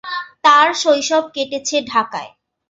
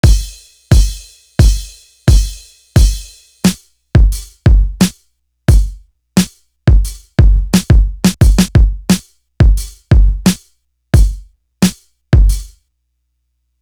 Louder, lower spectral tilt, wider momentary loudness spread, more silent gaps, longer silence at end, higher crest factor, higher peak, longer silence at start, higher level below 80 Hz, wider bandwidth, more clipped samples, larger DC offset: about the same, -15 LUFS vs -14 LUFS; second, -1 dB/octave vs -5.5 dB/octave; about the same, 14 LU vs 12 LU; neither; second, 0.45 s vs 1.15 s; about the same, 16 dB vs 12 dB; about the same, -2 dBFS vs 0 dBFS; about the same, 0.05 s vs 0.05 s; second, -64 dBFS vs -14 dBFS; second, 8 kHz vs 16.5 kHz; neither; neither